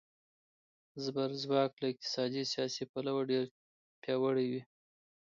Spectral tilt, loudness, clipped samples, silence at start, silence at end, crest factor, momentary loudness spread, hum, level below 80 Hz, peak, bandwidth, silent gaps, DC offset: -5 dB/octave; -36 LUFS; under 0.1%; 0.95 s; 0.7 s; 18 dB; 10 LU; none; -84 dBFS; -18 dBFS; 7.6 kHz; 1.73-1.77 s, 2.89-2.94 s, 3.51-4.02 s; under 0.1%